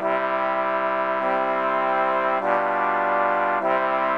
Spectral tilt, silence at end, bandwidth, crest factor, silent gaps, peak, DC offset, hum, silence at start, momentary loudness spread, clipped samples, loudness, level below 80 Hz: -6.5 dB/octave; 0 s; 6.6 kHz; 16 dB; none; -6 dBFS; 0.2%; none; 0 s; 2 LU; under 0.1%; -22 LUFS; -80 dBFS